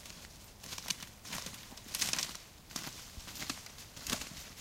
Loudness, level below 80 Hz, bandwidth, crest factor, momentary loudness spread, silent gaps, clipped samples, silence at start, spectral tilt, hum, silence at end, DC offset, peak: -40 LUFS; -60 dBFS; 16.5 kHz; 30 dB; 15 LU; none; under 0.1%; 0 s; -1 dB/octave; none; 0 s; under 0.1%; -14 dBFS